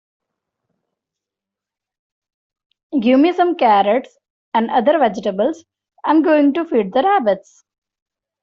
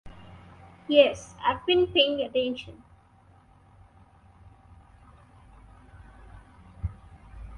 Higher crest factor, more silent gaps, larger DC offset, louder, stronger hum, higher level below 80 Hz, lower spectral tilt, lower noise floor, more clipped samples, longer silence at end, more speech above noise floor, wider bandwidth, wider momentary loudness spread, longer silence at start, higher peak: second, 16 dB vs 24 dB; first, 4.30-4.52 s vs none; neither; first, -16 LUFS vs -25 LUFS; neither; second, -64 dBFS vs -50 dBFS; first, -6.5 dB/octave vs -5 dB/octave; first, -86 dBFS vs -57 dBFS; neither; first, 1.05 s vs 0 s; first, 71 dB vs 33 dB; second, 7.2 kHz vs 10.5 kHz; second, 8 LU vs 26 LU; first, 2.9 s vs 0.05 s; first, -2 dBFS vs -6 dBFS